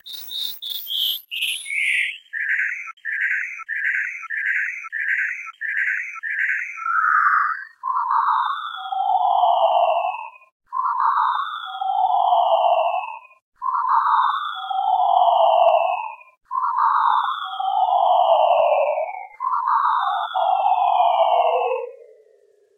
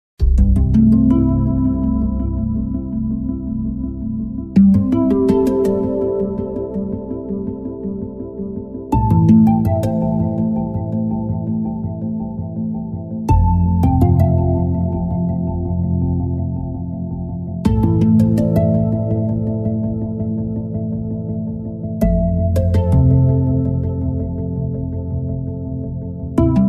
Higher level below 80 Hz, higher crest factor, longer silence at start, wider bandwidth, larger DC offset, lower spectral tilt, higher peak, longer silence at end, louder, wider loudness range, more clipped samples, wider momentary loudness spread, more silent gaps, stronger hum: second, -80 dBFS vs -26 dBFS; about the same, 16 dB vs 14 dB; second, 0.05 s vs 0.2 s; first, 16.5 kHz vs 13 kHz; neither; second, 2.5 dB/octave vs -11 dB/octave; about the same, -4 dBFS vs -2 dBFS; first, 0.75 s vs 0 s; about the same, -20 LUFS vs -18 LUFS; about the same, 4 LU vs 4 LU; neither; about the same, 11 LU vs 12 LU; first, 2.93-2.97 s, 10.52-10.60 s, 13.42-13.52 s vs none; neither